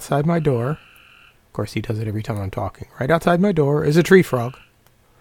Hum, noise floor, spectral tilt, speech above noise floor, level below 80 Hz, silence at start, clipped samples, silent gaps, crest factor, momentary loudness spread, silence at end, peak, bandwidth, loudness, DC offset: none; -56 dBFS; -7 dB/octave; 37 dB; -46 dBFS; 0 s; under 0.1%; none; 20 dB; 15 LU; 0.7 s; 0 dBFS; 17.5 kHz; -19 LUFS; under 0.1%